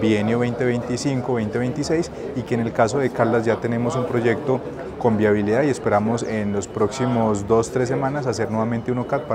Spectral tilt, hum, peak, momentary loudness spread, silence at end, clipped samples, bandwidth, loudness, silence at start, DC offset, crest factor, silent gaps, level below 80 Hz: -6.5 dB/octave; none; -2 dBFS; 5 LU; 0 s; under 0.1%; 11.5 kHz; -21 LUFS; 0 s; under 0.1%; 18 dB; none; -50 dBFS